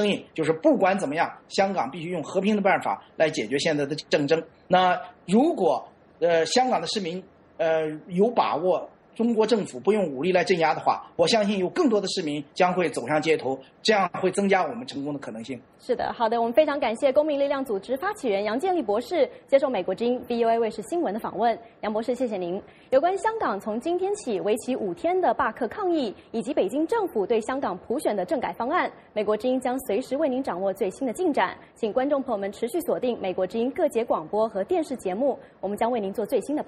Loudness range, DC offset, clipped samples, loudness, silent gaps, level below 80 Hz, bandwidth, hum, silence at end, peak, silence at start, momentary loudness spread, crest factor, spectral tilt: 3 LU; under 0.1%; under 0.1%; -25 LUFS; none; -64 dBFS; 13.5 kHz; none; 0.05 s; -6 dBFS; 0 s; 7 LU; 18 dB; -5 dB/octave